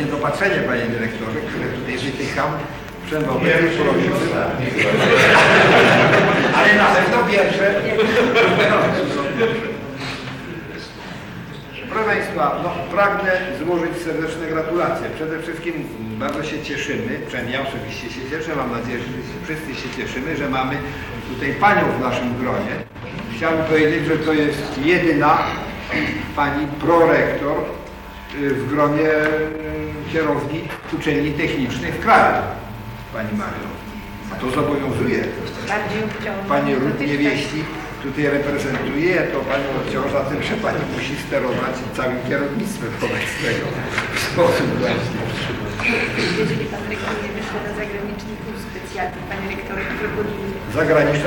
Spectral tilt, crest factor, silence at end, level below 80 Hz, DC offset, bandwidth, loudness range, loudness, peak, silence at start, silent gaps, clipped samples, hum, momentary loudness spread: -5.5 dB/octave; 18 dB; 0 s; -42 dBFS; under 0.1%; 19 kHz; 11 LU; -19 LUFS; -2 dBFS; 0 s; none; under 0.1%; none; 14 LU